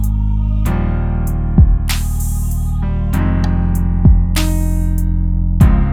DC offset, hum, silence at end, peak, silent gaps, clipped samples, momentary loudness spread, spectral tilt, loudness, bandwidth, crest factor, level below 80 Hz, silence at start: under 0.1%; none; 0 s; 0 dBFS; none; under 0.1%; 7 LU; -6.5 dB/octave; -16 LUFS; 16 kHz; 12 dB; -16 dBFS; 0 s